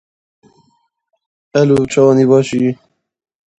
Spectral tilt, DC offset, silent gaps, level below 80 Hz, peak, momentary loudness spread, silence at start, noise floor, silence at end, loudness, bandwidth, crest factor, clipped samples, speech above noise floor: -7 dB/octave; under 0.1%; none; -52 dBFS; 0 dBFS; 9 LU; 1.55 s; -66 dBFS; 0.85 s; -13 LUFS; 10 kHz; 16 dB; under 0.1%; 55 dB